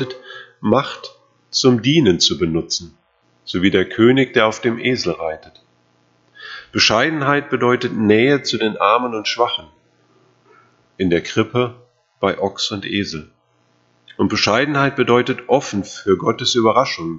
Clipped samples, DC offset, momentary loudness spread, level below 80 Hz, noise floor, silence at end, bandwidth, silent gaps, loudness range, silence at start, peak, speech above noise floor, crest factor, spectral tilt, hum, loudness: under 0.1%; under 0.1%; 13 LU; -52 dBFS; -60 dBFS; 0 s; 8 kHz; none; 6 LU; 0 s; 0 dBFS; 43 dB; 18 dB; -4.5 dB/octave; 60 Hz at -45 dBFS; -17 LUFS